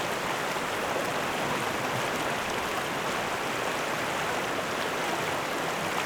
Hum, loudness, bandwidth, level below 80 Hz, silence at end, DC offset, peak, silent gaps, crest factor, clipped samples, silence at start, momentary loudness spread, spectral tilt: none; -29 LUFS; over 20 kHz; -58 dBFS; 0 s; under 0.1%; -14 dBFS; none; 16 dB; under 0.1%; 0 s; 1 LU; -3 dB/octave